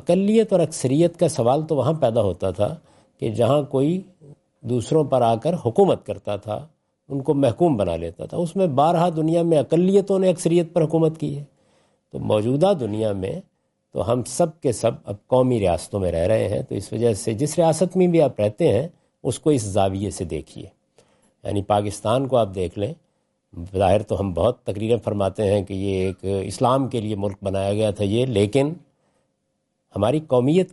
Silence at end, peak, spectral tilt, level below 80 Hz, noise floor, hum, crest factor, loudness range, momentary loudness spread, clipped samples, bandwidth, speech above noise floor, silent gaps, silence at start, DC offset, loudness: 0.05 s; -6 dBFS; -7 dB/octave; -54 dBFS; -73 dBFS; none; 16 dB; 4 LU; 11 LU; under 0.1%; 11.5 kHz; 53 dB; none; 0.05 s; under 0.1%; -21 LUFS